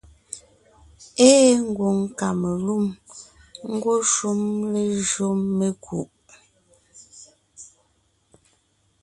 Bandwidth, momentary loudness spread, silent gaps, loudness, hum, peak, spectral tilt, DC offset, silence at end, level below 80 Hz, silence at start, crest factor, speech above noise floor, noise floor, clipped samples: 11.5 kHz; 23 LU; none; -21 LUFS; none; 0 dBFS; -4.5 dB/octave; under 0.1%; 1.35 s; -58 dBFS; 0.3 s; 22 dB; 45 dB; -66 dBFS; under 0.1%